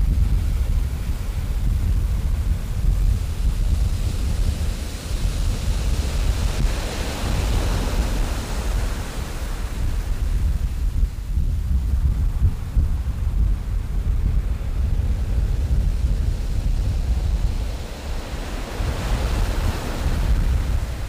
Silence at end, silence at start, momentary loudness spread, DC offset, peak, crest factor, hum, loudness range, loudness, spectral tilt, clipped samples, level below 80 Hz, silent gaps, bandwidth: 0 s; 0 s; 5 LU; under 0.1%; -6 dBFS; 14 dB; none; 2 LU; -25 LUFS; -6 dB/octave; under 0.1%; -22 dBFS; none; 15.5 kHz